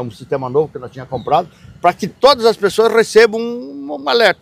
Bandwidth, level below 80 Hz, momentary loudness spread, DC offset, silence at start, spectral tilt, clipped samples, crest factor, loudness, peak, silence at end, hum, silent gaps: 15.5 kHz; -52 dBFS; 16 LU; under 0.1%; 0 s; -4 dB/octave; 0.3%; 14 dB; -14 LUFS; 0 dBFS; 0.1 s; none; none